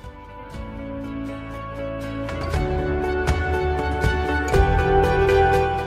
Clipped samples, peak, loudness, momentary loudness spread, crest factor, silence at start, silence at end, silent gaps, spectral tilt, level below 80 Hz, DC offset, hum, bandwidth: under 0.1%; -4 dBFS; -22 LUFS; 16 LU; 18 dB; 0 s; 0 s; none; -6.5 dB/octave; -28 dBFS; under 0.1%; none; 15 kHz